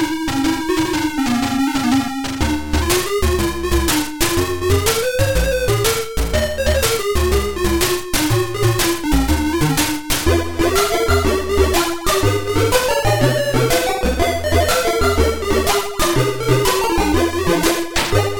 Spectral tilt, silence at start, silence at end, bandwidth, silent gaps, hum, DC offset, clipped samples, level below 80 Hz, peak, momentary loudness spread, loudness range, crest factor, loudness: -4.5 dB/octave; 0 s; 0 s; 17.5 kHz; none; none; under 0.1%; under 0.1%; -26 dBFS; -2 dBFS; 3 LU; 2 LU; 14 dB; -17 LUFS